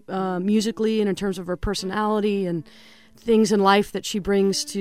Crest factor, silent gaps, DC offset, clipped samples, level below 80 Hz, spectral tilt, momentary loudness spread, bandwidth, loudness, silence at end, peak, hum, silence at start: 18 dB; none; 0.2%; under 0.1%; -44 dBFS; -5 dB/octave; 9 LU; 15.5 kHz; -22 LUFS; 0 s; -4 dBFS; none; 0.1 s